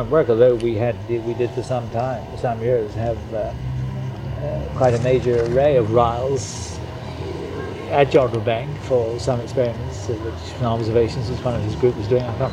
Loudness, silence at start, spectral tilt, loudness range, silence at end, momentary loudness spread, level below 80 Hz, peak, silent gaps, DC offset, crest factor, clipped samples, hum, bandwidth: -21 LUFS; 0 s; -7 dB/octave; 4 LU; 0 s; 12 LU; -38 dBFS; -2 dBFS; none; under 0.1%; 18 dB; under 0.1%; none; 10.5 kHz